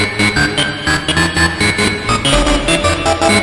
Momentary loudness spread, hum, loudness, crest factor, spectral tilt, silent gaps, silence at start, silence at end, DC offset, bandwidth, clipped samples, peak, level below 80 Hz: 2 LU; none; -13 LUFS; 14 dB; -3.5 dB/octave; none; 0 s; 0 s; under 0.1%; 11.5 kHz; under 0.1%; 0 dBFS; -26 dBFS